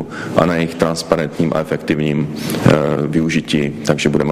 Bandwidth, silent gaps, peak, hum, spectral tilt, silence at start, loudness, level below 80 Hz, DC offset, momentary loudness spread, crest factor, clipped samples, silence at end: 15.5 kHz; none; 0 dBFS; none; -6 dB/octave; 0 s; -17 LUFS; -42 dBFS; under 0.1%; 5 LU; 16 dB; under 0.1%; 0 s